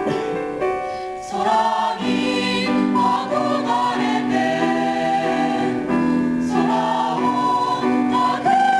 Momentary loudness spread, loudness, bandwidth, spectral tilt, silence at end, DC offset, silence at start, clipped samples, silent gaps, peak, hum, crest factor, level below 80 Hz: 5 LU; -20 LUFS; 11 kHz; -5 dB/octave; 0 s; under 0.1%; 0 s; under 0.1%; none; -8 dBFS; none; 12 dB; -54 dBFS